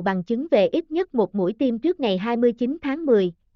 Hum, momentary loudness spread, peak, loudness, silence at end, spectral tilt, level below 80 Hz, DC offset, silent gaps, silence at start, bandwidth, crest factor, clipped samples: none; 5 LU; -8 dBFS; -22 LUFS; 0.25 s; -5.5 dB/octave; -58 dBFS; under 0.1%; none; 0 s; 6.4 kHz; 14 dB; under 0.1%